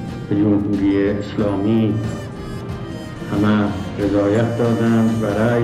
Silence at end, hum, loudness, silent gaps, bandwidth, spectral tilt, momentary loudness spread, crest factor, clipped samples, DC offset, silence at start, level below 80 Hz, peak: 0 s; none; -19 LUFS; none; 12.5 kHz; -8 dB/octave; 12 LU; 12 dB; under 0.1%; under 0.1%; 0 s; -42 dBFS; -6 dBFS